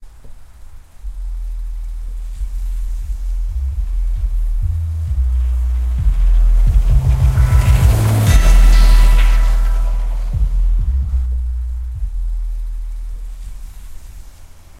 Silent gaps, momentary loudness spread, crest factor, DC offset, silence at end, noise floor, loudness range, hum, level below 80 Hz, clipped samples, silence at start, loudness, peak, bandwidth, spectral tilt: none; 17 LU; 14 dB; under 0.1%; 0.2 s; -37 dBFS; 13 LU; none; -14 dBFS; under 0.1%; 0 s; -17 LUFS; 0 dBFS; 14 kHz; -6 dB/octave